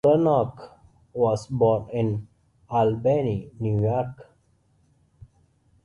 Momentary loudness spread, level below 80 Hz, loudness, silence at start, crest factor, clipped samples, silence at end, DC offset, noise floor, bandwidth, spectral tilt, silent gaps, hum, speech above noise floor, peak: 11 LU; -54 dBFS; -24 LUFS; 0.05 s; 16 dB; under 0.1%; 1.6 s; under 0.1%; -64 dBFS; 11 kHz; -9 dB/octave; none; none; 41 dB; -8 dBFS